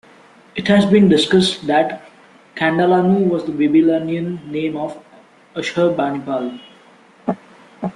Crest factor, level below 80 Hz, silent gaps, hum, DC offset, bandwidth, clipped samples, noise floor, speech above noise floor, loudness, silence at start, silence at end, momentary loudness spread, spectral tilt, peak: 16 dB; -56 dBFS; none; none; under 0.1%; 11.5 kHz; under 0.1%; -48 dBFS; 32 dB; -17 LUFS; 0.55 s; 0.05 s; 16 LU; -6 dB/octave; -2 dBFS